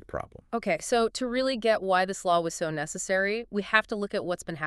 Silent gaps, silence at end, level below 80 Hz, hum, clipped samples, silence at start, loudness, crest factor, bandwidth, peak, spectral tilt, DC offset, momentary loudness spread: none; 0 s; -56 dBFS; none; under 0.1%; 0.1 s; -27 LUFS; 22 dB; 13.5 kHz; -6 dBFS; -3.5 dB/octave; under 0.1%; 8 LU